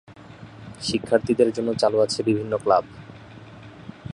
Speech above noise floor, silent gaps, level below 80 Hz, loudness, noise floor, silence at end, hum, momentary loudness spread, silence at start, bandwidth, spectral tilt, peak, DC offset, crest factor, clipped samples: 22 dB; none; -54 dBFS; -22 LUFS; -43 dBFS; 0 s; none; 23 LU; 0.1 s; 11 kHz; -5.5 dB/octave; -4 dBFS; under 0.1%; 20 dB; under 0.1%